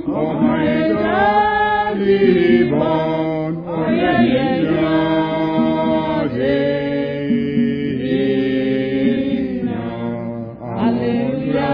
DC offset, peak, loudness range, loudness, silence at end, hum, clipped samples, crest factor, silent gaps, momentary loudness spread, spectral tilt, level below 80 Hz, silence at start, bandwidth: under 0.1%; -2 dBFS; 4 LU; -17 LUFS; 0 s; none; under 0.1%; 16 dB; none; 8 LU; -9.5 dB/octave; -44 dBFS; 0 s; 5.2 kHz